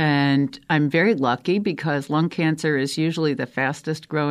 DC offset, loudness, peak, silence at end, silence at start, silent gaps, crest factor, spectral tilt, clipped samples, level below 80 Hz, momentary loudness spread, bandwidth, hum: under 0.1%; -22 LUFS; -6 dBFS; 0 s; 0 s; none; 16 dB; -6.5 dB/octave; under 0.1%; -64 dBFS; 6 LU; 14 kHz; none